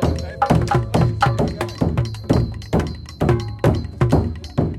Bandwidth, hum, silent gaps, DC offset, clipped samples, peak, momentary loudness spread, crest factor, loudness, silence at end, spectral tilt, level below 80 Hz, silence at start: 13.5 kHz; none; none; under 0.1%; under 0.1%; -2 dBFS; 5 LU; 18 dB; -20 LUFS; 0 s; -7.5 dB/octave; -30 dBFS; 0 s